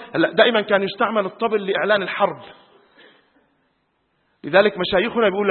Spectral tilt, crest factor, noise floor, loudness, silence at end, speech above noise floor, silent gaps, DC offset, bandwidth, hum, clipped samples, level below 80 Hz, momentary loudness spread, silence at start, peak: -9.5 dB/octave; 20 dB; -68 dBFS; -19 LUFS; 0 s; 49 dB; none; under 0.1%; 4.4 kHz; none; under 0.1%; -58 dBFS; 6 LU; 0 s; 0 dBFS